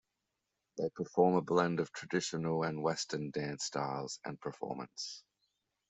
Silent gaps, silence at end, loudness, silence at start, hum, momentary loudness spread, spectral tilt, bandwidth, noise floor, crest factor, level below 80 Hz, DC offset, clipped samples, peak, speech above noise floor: none; 0.7 s; -36 LUFS; 0.75 s; none; 13 LU; -5 dB/octave; 8.2 kHz; -87 dBFS; 22 dB; -76 dBFS; under 0.1%; under 0.1%; -14 dBFS; 51 dB